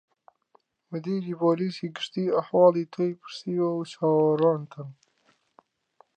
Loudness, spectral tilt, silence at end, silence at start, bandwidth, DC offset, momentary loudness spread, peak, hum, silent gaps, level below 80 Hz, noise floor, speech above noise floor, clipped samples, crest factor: -26 LUFS; -7.5 dB/octave; 1.25 s; 0.9 s; 9 kHz; under 0.1%; 16 LU; -8 dBFS; none; none; -80 dBFS; -68 dBFS; 43 dB; under 0.1%; 20 dB